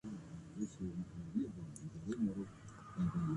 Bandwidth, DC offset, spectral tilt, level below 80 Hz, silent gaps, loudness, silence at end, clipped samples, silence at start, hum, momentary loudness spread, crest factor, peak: 11.5 kHz; under 0.1%; -8 dB/octave; -62 dBFS; none; -44 LUFS; 0 s; under 0.1%; 0.05 s; none; 11 LU; 14 dB; -28 dBFS